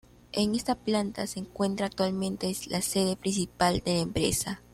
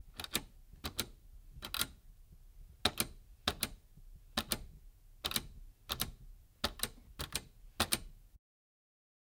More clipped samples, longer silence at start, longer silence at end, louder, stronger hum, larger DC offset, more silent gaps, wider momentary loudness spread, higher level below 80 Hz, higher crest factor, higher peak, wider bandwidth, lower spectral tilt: neither; first, 0.35 s vs 0 s; second, 0.15 s vs 1 s; first, -29 LUFS vs -39 LUFS; neither; neither; neither; second, 5 LU vs 18 LU; about the same, -52 dBFS vs -54 dBFS; second, 18 dB vs 32 dB; about the same, -10 dBFS vs -10 dBFS; second, 15.5 kHz vs 18 kHz; first, -4.5 dB/octave vs -2 dB/octave